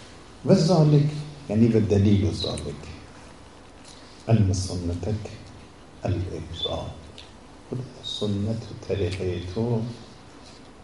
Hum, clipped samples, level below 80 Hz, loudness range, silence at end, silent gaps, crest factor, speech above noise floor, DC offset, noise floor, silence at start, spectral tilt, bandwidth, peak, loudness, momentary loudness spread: none; under 0.1%; -48 dBFS; 10 LU; 0 s; none; 22 dB; 24 dB; 0.2%; -47 dBFS; 0 s; -7 dB/octave; 11.5 kHz; -4 dBFS; -25 LUFS; 25 LU